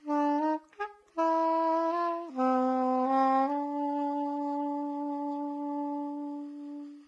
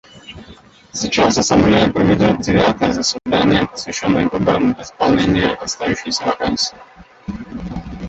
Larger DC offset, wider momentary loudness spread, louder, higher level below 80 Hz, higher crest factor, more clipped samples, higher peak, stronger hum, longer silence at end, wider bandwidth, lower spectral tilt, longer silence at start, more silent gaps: neither; second, 12 LU vs 16 LU; second, -30 LUFS vs -16 LUFS; second, -90 dBFS vs -38 dBFS; about the same, 16 dB vs 16 dB; neither; second, -14 dBFS vs -2 dBFS; neither; about the same, 0.05 s vs 0 s; second, 7.4 kHz vs 8.2 kHz; about the same, -5.5 dB/octave vs -4.5 dB/octave; second, 0 s vs 0.15 s; neither